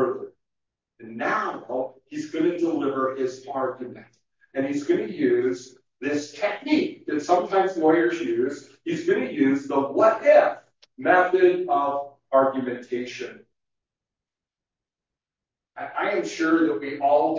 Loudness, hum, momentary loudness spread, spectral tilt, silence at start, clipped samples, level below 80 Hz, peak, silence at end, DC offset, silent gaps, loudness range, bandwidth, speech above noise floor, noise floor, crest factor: -23 LUFS; none; 14 LU; -5.5 dB/octave; 0 s; under 0.1%; -76 dBFS; -6 dBFS; 0 s; under 0.1%; none; 8 LU; 7.6 kHz; 67 dB; -90 dBFS; 18 dB